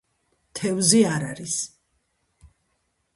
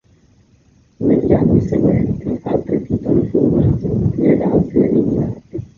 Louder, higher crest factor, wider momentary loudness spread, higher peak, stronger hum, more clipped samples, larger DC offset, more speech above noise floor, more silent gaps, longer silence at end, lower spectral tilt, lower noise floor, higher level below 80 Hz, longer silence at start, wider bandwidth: second, -22 LUFS vs -16 LUFS; first, 24 dB vs 14 dB; first, 15 LU vs 7 LU; about the same, -2 dBFS vs -2 dBFS; neither; neither; neither; first, 50 dB vs 38 dB; neither; first, 1.5 s vs 0.15 s; second, -3.5 dB/octave vs -11.5 dB/octave; first, -72 dBFS vs -52 dBFS; second, -62 dBFS vs -34 dBFS; second, 0.55 s vs 1 s; first, 11.5 kHz vs 7 kHz